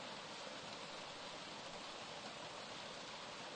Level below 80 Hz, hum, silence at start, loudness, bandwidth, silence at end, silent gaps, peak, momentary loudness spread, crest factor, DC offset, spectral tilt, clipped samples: -80 dBFS; none; 0 s; -49 LUFS; 11 kHz; 0 s; none; -36 dBFS; 0 LU; 14 dB; under 0.1%; -2 dB/octave; under 0.1%